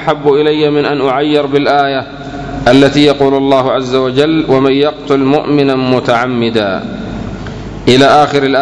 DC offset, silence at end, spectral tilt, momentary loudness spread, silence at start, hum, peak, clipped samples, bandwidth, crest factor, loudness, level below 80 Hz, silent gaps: under 0.1%; 0 s; -6 dB/octave; 14 LU; 0 s; none; 0 dBFS; 1%; 11 kHz; 10 dB; -10 LUFS; -36 dBFS; none